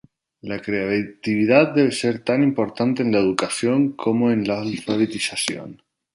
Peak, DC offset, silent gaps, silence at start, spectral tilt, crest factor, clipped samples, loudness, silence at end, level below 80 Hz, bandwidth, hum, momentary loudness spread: -2 dBFS; under 0.1%; none; 0.45 s; -5 dB/octave; 18 dB; under 0.1%; -20 LUFS; 0.4 s; -60 dBFS; 11.5 kHz; none; 9 LU